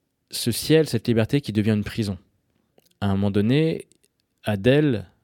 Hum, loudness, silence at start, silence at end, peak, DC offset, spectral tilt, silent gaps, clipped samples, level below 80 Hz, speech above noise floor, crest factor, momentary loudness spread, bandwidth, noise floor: none; -23 LUFS; 0.3 s; 0.2 s; -4 dBFS; under 0.1%; -6 dB/octave; none; under 0.1%; -54 dBFS; 47 dB; 18 dB; 10 LU; 17.5 kHz; -68 dBFS